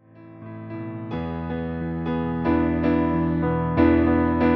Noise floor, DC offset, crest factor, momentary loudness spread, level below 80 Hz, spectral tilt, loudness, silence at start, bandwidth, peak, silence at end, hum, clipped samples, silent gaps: -42 dBFS; under 0.1%; 16 dB; 15 LU; -38 dBFS; -11 dB/octave; -23 LUFS; 0.15 s; 5.4 kHz; -6 dBFS; 0 s; none; under 0.1%; none